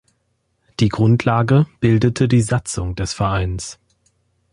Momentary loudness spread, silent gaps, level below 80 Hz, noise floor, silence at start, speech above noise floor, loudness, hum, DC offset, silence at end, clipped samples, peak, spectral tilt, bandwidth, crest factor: 10 LU; none; -36 dBFS; -67 dBFS; 0.8 s; 51 dB; -18 LUFS; none; under 0.1%; 0.8 s; under 0.1%; -2 dBFS; -6.5 dB/octave; 11.5 kHz; 16 dB